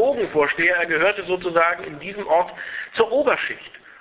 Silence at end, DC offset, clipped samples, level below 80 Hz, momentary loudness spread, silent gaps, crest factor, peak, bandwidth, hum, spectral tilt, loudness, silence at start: 0.25 s; under 0.1%; under 0.1%; -58 dBFS; 13 LU; none; 20 dB; -2 dBFS; 4 kHz; none; -7.5 dB/octave; -20 LUFS; 0 s